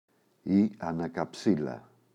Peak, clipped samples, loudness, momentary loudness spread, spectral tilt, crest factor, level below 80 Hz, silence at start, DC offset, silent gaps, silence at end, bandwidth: -12 dBFS; under 0.1%; -30 LUFS; 13 LU; -7.5 dB/octave; 18 dB; -64 dBFS; 0.45 s; under 0.1%; none; 0.35 s; 10 kHz